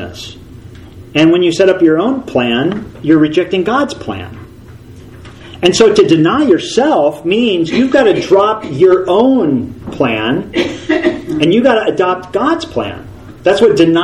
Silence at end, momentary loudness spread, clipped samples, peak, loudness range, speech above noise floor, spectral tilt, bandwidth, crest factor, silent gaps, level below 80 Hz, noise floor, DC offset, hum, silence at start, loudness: 0 s; 11 LU; 0.3%; 0 dBFS; 4 LU; 23 dB; -5.5 dB/octave; 11.5 kHz; 12 dB; none; -42 dBFS; -34 dBFS; under 0.1%; none; 0 s; -11 LUFS